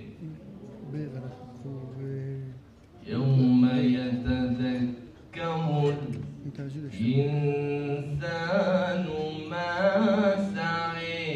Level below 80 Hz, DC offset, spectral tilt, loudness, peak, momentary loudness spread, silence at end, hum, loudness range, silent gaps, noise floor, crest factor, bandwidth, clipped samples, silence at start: -54 dBFS; under 0.1%; -8 dB/octave; -28 LUFS; -12 dBFS; 19 LU; 0 s; none; 4 LU; none; -50 dBFS; 16 dB; 8.2 kHz; under 0.1%; 0 s